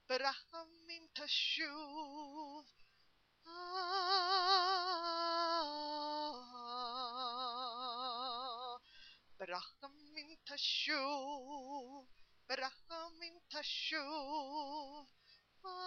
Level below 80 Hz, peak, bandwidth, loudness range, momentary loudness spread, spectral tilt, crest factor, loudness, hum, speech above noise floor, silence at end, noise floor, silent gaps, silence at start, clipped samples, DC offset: -80 dBFS; -18 dBFS; 7.2 kHz; 8 LU; 18 LU; -1 dB/octave; 24 dB; -40 LUFS; none; 31 dB; 0 s; -74 dBFS; none; 0.1 s; under 0.1%; under 0.1%